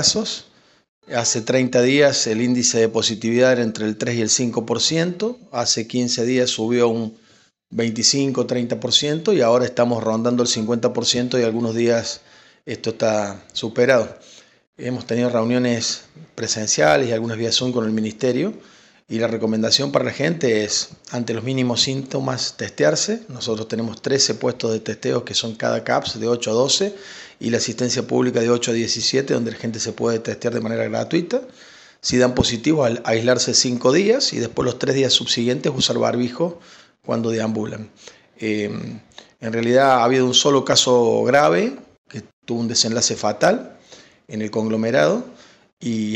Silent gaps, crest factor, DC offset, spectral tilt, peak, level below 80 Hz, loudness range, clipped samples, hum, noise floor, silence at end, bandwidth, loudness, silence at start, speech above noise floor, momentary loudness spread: 0.89-1.01 s, 14.67-14.73 s, 41.98-42.05 s, 42.33-42.42 s, 45.73-45.77 s; 18 dB; under 0.1%; -3.5 dB/octave; -2 dBFS; -54 dBFS; 4 LU; under 0.1%; none; -47 dBFS; 0 s; 9 kHz; -19 LUFS; 0 s; 28 dB; 11 LU